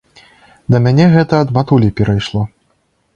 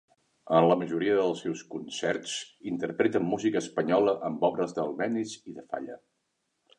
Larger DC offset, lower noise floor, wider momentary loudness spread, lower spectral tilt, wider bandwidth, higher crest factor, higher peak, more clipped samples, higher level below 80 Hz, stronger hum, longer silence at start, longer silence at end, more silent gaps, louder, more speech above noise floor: neither; second, -60 dBFS vs -78 dBFS; about the same, 11 LU vs 13 LU; first, -8 dB/octave vs -5 dB/octave; second, 7.6 kHz vs 11 kHz; second, 14 dB vs 20 dB; first, 0 dBFS vs -10 dBFS; neither; first, -38 dBFS vs -70 dBFS; neither; first, 0.7 s vs 0.45 s; second, 0.7 s vs 0.85 s; neither; first, -12 LUFS vs -29 LUFS; about the same, 49 dB vs 50 dB